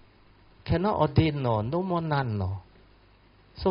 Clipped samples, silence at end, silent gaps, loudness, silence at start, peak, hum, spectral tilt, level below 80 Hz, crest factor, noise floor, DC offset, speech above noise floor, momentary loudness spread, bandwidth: under 0.1%; 0 s; none; -27 LUFS; 0.65 s; -8 dBFS; none; -6.5 dB/octave; -48 dBFS; 20 dB; -58 dBFS; under 0.1%; 32 dB; 10 LU; 5.6 kHz